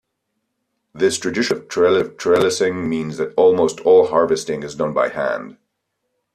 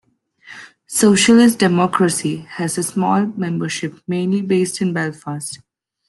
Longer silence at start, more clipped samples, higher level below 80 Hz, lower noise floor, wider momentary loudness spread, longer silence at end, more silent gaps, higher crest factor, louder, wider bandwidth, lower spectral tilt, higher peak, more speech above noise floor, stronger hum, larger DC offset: first, 0.95 s vs 0.45 s; neither; about the same, -58 dBFS vs -58 dBFS; first, -74 dBFS vs -46 dBFS; second, 9 LU vs 16 LU; first, 0.85 s vs 0.5 s; neither; about the same, 16 dB vs 16 dB; about the same, -18 LUFS vs -17 LUFS; about the same, 13 kHz vs 12.5 kHz; about the same, -4.5 dB/octave vs -4.5 dB/octave; about the same, -4 dBFS vs -2 dBFS; first, 57 dB vs 29 dB; neither; neither